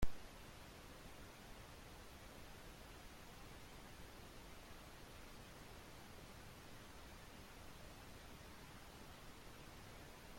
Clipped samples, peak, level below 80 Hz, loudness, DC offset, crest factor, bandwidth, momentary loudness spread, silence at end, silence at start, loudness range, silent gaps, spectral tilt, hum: under 0.1%; -26 dBFS; -60 dBFS; -58 LUFS; under 0.1%; 26 dB; 16.5 kHz; 0 LU; 0 s; 0 s; 0 LU; none; -4 dB/octave; none